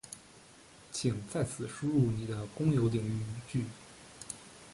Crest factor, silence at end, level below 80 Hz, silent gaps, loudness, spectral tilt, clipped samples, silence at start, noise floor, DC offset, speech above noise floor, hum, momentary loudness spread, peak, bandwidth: 18 dB; 0 s; -58 dBFS; none; -34 LUFS; -6.5 dB/octave; under 0.1%; 0.05 s; -57 dBFS; under 0.1%; 24 dB; none; 21 LU; -16 dBFS; 11.5 kHz